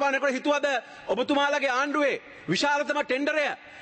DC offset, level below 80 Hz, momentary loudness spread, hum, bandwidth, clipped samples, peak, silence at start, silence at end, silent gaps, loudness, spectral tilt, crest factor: under 0.1%; -68 dBFS; 6 LU; none; 8.8 kHz; under 0.1%; -14 dBFS; 0 s; 0 s; none; -26 LUFS; -3.5 dB/octave; 12 dB